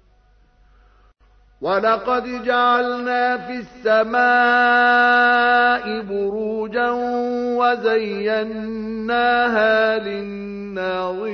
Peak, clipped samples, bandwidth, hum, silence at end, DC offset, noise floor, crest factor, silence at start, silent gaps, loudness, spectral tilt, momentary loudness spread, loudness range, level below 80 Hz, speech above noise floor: -4 dBFS; under 0.1%; 6.4 kHz; none; 0 s; under 0.1%; -55 dBFS; 14 dB; 1.6 s; none; -18 LUFS; -5.5 dB/octave; 13 LU; 5 LU; -54 dBFS; 36 dB